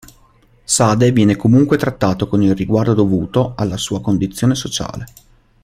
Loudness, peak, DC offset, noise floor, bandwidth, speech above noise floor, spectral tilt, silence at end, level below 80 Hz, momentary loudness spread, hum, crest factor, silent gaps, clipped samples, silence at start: -15 LUFS; -2 dBFS; under 0.1%; -51 dBFS; 15.5 kHz; 36 dB; -5.5 dB/octave; 0.55 s; -42 dBFS; 10 LU; none; 14 dB; none; under 0.1%; 0.7 s